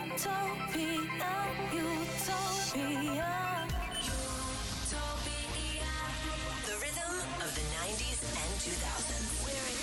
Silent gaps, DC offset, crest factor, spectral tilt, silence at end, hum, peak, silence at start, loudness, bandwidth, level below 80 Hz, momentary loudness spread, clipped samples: none; under 0.1%; 12 dB; -3 dB/octave; 0 s; none; -24 dBFS; 0 s; -35 LUFS; 19 kHz; -44 dBFS; 3 LU; under 0.1%